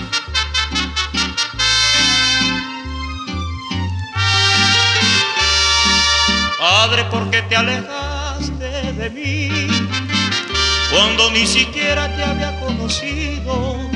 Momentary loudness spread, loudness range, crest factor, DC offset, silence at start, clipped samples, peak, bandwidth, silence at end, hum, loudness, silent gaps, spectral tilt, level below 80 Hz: 12 LU; 5 LU; 16 dB; under 0.1%; 0 s; under 0.1%; 0 dBFS; 12 kHz; 0 s; none; -15 LUFS; none; -2.5 dB/octave; -30 dBFS